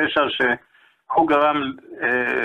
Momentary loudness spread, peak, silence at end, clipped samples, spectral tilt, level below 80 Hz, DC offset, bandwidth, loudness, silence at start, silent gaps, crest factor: 9 LU; -6 dBFS; 0 s; under 0.1%; -6 dB/octave; -58 dBFS; under 0.1%; 9.8 kHz; -20 LUFS; 0 s; none; 14 dB